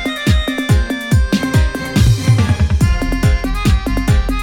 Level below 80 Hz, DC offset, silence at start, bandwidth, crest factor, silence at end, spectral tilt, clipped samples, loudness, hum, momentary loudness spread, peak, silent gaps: -18 dBFS; under 0.1%; 0 s; 17.5 kHz; 12 dB; 0 s; -6 dB/octave; under 0.1%; -15 LUFS; none; 3 LU; 0 dBFS; none